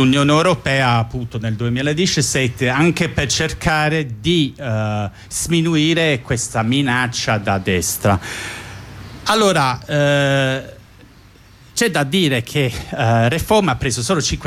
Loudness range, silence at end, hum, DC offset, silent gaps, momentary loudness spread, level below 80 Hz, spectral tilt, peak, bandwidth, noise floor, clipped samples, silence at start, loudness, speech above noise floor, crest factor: 2 LU; 0 s; none; under 0.1%; none; 9 LU; -38 dBFS; -4.5 dB/octave; -4 dBFS; 16 kHz; -45 dBFS; under 0.1%; 0 s; -17 LUFS; 28 dB; 14 dB